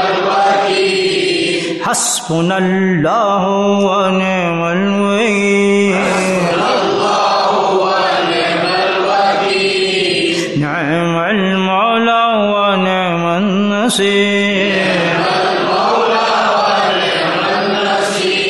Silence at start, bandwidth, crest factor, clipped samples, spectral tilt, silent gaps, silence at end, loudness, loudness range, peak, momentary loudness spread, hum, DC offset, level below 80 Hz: 0 s; 12.5 kHz; 12 dB; under 0.1%; -4 dB/octave; none; 0 s; -13 LUFS; 1 LU; -2 dBFS; 3 LU; none; under 0.1%; -54 dBFS